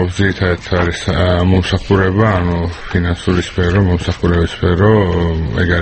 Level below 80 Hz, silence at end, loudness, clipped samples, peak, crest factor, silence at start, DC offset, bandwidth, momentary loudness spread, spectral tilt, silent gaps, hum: -26 dBFS; 0 s; -14 LUFS; under 0.1%; 0 dBFS; 14 dB; 0 s; under 0.1%; 8.6 kHz; 5 LU; -7 dB/octave; none; none